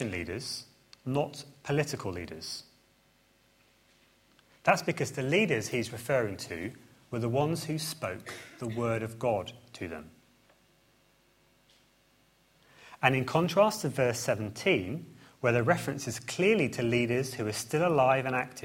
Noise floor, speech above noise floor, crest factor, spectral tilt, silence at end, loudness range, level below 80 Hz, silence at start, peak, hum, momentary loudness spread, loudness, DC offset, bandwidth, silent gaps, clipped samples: -66 dBFS; 36 dB; 24 dB; -5 dB/octave; 0 s; 9 LU; -66 dBFS; 0 s; -8 dBFS; none; 14 LU; -30 LUFS; under 0.1%; 16.5 kHz; none; under 0.1%